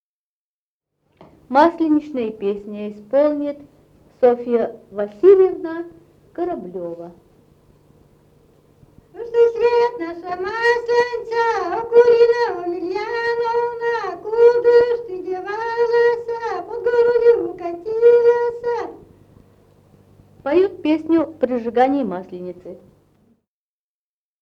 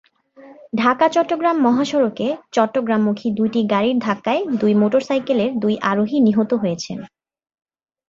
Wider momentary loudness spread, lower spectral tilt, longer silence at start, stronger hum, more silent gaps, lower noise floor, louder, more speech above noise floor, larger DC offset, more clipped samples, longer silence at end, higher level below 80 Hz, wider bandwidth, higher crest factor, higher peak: first, 16 LU vs 5 LU; about the same, -6 dB/octave vs -6 dB/octave; first, 1.5 s vs 0.4 s; neither; neither; first, under -90 dBFS vs -45 dBFS; about the same, -18 LUFS vs -18 LUFS; first, over 72 dB vs 28 dB; neither; neither; first, 1.65 s vs 1 s; about the same, -58 dBFS vs -62 dBFS; about the same, 7 kHz vs 7.6 kHz; about the same, 18 dB vs 16 dB; about the same, 0 dBFS vs -2 dBFS